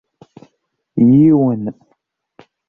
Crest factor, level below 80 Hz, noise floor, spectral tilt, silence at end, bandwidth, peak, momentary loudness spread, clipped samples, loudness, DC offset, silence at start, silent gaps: 14 dB; -52 dBFS; -67 dBFS; -12.5 dB/octave; 0.95 s; 3.2 kHz; -2 dBFS; 17 LU; under 0.1%; -12 LUFS; under 0.1%; 0.95 s; none